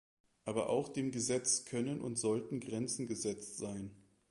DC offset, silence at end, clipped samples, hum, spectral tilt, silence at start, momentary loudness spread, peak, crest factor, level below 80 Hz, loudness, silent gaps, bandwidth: under 0.1%; 0.3 s; under 0.1%; none; -4 dB/octave; 0.45 s; 10 LU; -18 dBFS; 20 dB; -72 dBFS; -37 LUFS; none; 11.5 kHz